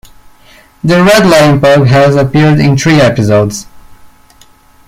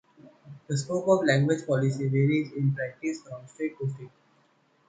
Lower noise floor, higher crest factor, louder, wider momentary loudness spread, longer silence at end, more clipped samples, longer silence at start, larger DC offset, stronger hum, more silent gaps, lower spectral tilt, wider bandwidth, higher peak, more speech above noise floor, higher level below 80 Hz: second, -41 dBFS vs -66 dBFS; second, 8 dB vs 18 dB; first, -7 LUFS vs -27 LUFS; second, 6 LU vs 12 LU; about the same, 0.8 s vs 0.8 s; neither; first, 0.85 s vs 0.25 s; neither; neither; neither; about the same, -6 dB/octave vs -6.5 dB/octave; first, 16 kHz vs 9.4 kHz; first, 0 dBFS vs -8 dBFS; second, 35 dB vs 39 dB; first, -36 dBFS vs -68 dBFS